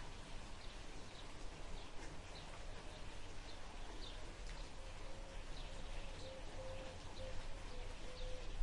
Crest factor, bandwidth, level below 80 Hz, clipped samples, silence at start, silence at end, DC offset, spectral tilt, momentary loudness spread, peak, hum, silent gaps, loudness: 18 dB; 11.5 kHz; -52 dBFS; under 0.1%; 0 s; 0 s; under 0.1%; -4 dB/octave; 3 LU; -28 dBFS; none; none; -53 LUFS